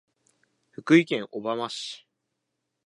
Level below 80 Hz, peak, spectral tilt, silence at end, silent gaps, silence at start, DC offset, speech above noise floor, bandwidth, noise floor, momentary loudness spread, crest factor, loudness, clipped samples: -82 dBFS; -6 dBFS; -5.5 dB/octave; 0.9 s; none; 0.8 s; under 0.1%; 56 dB; 10.5 kHz; -81 dBFS; 19 LU; 22 dB; -25 LUFS; under 0.1%